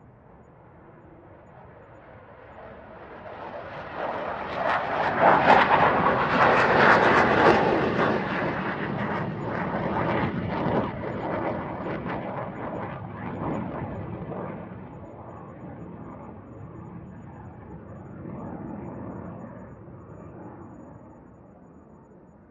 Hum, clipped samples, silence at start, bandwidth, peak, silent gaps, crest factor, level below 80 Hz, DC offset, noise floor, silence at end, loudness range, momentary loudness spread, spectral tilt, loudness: none; under 0.1%; 0.35 s; 9.2 kHz; -2 dBFS; none; 26 dB; -54 dBFS; under 0.1%; -51 dBFS; 0.3 s; 22 LU; 25 LU; -7 dB/octave; -24 LUFS